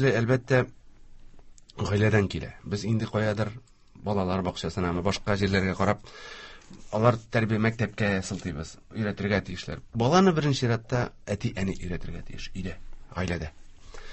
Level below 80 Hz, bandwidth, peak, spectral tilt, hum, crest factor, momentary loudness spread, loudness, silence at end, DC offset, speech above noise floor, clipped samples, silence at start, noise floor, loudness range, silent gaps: -46 dBFS; 8.6 kHz; -6 dBFS; -6.5 dB/octave; none; 20 dB; 16 LU; -27 LUFS; 0 s; under 0.1%; 21 dB; under 0.1%; 0 s; -48 dBFS; 3 LU; none